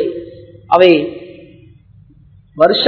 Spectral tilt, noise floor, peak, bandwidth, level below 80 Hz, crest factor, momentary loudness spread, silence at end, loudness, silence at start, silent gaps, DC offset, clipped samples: -7 dB/octave; -45 dBFS; 0 dBFS; 5.4 kHz; -52 dBFS; 16 dB; 23 LU; 0 s; -12 LUFS; 0 s; none; under 0.1%; 0.3%